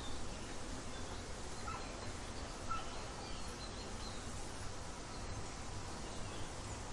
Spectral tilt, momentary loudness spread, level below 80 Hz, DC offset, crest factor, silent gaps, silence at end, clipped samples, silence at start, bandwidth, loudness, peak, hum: -3.5 dB/octave; 3 LU; -50 dBFS; under 0.1%; 16 dB; none; 0 s; under 0.1%; 0 s; 11.5 kHz; -46 LUFS; -28 dBFS; none